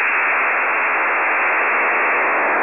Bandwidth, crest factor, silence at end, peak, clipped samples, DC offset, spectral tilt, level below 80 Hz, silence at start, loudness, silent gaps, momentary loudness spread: 3.7 kHz; 10 dB; 0 s; -8 dBFS; under 0.1%; 0.3%; -5 dB/octave; -70 dBFS; 0 s; -16 LUFS; none; 1 LU